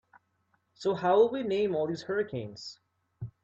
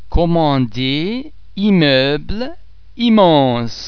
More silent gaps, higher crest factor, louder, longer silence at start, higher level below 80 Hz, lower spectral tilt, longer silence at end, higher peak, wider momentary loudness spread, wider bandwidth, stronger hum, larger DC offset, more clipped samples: neither; about the same, 20 dB vs 16 dB; second, -29 LUFS vs -14 LUFS; first, 0.8 s vs 0 s; second, -68 dBFS vs -30 dBFS; about the same, -6.5 dB/octave vs -7 dB/octave; first, 0.15 s vs 0 s; second, -12 dBFS vs 0 dBFS; first, 20 LU vs 14 LU; first, 7.8 kHz vs 5.4 kHz; neither; second, under 0.1% vs 2%; neither